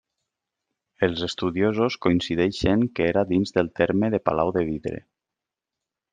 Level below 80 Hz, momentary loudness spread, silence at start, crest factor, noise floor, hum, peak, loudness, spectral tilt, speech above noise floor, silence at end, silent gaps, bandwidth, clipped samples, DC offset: -50 dBFS; 5 LU; 1 s; 20 dB; -87 dBFS; none; -4 dBFS; -23 LUFS; -6.5 dB/octave; 65 dB; 1.15 s; none; 9.4 kHz; under 0.1%; under 0.1%